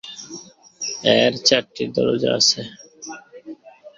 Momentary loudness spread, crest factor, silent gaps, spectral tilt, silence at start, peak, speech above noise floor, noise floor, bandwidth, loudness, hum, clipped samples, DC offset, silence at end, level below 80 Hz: 22 LU; 22 dB; none; -2.5 dB/octave; 0.05 s; 0 dBFS; 22 dB; -40 dBFS; 7.8 kHz; -18 LUFS; none; under 0.1%; under 0.1%; 0.1 s; -60 dBFS